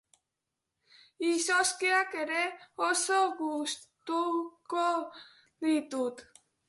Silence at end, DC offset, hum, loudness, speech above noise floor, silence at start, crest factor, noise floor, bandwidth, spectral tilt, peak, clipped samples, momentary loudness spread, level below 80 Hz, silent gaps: 0.45 s; under 0.1%; none; -30 LUFS; 56 dB; 1.2 s; 18 dB; -87 dBFS; 12 kHz; -0.5 dB/octave; -14 dBFS; under 0.1%; 9 LU; -82 dBFS; none